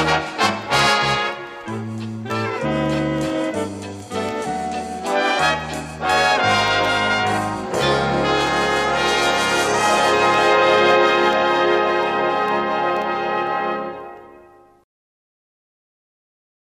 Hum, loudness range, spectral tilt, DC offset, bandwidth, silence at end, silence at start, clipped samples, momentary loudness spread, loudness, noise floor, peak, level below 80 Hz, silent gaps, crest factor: none; 8 LU; -4 dB/octave; under 0.1%; 15.5 kHz; 2.25 s; 0 s; under 0.1%; 12 LU; -18 LUFS; -48 dBFS; -2 dBFS; -46 dBFS; none; 18 dB